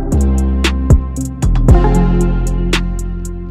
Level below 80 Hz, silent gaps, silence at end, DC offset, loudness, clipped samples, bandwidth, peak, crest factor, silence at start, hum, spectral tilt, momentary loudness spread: -14 dBFS; none; 0 s; under 0.1%; -14 LUFS; under 0.1%; 12.5 kHz; 0 dBFS; 12 dB; 0 s; none; -6.5 dB/octave; 11 LU